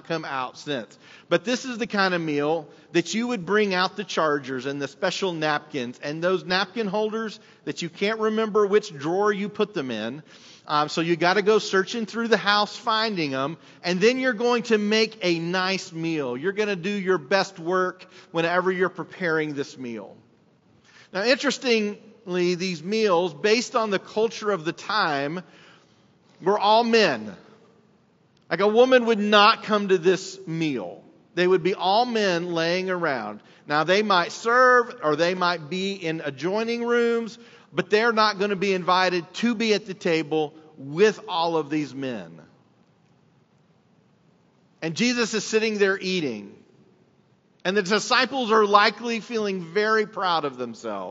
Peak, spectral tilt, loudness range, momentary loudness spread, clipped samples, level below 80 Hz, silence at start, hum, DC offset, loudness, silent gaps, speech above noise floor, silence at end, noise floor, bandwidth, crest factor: 0 dBFS; -2.5 dB/octave; 5 LU; 12 LU; under 0.1%; -78 dBFS; 0.05 s; none; under 0.1%; -23 LUFS; none; 38 dB; 0 s; -61 dBFS; 8 kHz; 24 dB